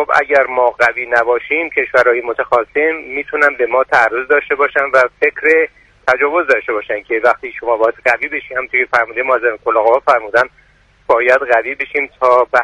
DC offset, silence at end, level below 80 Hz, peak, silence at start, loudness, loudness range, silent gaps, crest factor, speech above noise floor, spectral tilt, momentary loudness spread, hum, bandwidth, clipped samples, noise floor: under 0.1%; 0 s; -52 dBFS; 0 dBFS; 0 s; -14 LUFS; 2 LU; none; 14 dB; 20 dB; -4 dB/octave; 7 LU; none; 11 kHz; under 0.1%; -33 dBFS